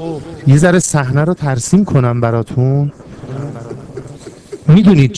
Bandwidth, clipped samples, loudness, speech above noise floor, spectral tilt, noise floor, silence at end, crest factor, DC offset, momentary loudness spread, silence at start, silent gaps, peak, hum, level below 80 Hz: 11 kHz; 0.9%; -12 LUFS; 21 dB; -6.5 dB/octave; -33 dBFS; 0 s; 12 dB; under 0.1%; 21 LU; 0 s; none; 0 dBFS; none; -40 dBFS